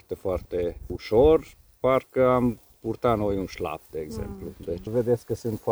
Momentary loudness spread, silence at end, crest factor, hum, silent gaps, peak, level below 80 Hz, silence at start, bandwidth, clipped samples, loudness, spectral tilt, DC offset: 15 LU; 0 s; 18 dB; none; none; -8 dBFS; -42 dBFS; 0.1 s; over 20 kHz; under 0.1%; -26 LUFS; -7.5 dB/octave; under 0.1%